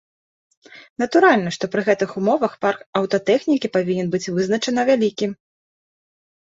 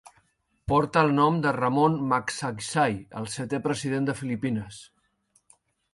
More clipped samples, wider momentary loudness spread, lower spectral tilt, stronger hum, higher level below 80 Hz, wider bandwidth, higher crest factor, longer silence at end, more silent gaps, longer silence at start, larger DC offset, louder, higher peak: neither; second, 9 LU vs 12 LU; about the same, -5.5 dB/octave vs -5.5 dB/octave; neither; second, -64 dBFS vs -56 dBFS; second, 7.8 kHz vs 11.5 kHz; about the same, 18 dB vs 20 dB; about the same, 1.2 s vs 1.1 s; first, 0.90-0.96 s, 2.86-2.93 s vs none; about the same, 0.75 s vs 0.65 s; neither; first, -20 LUFS vs -26 LUFS; first, -2 dBFS vs -8 dBFS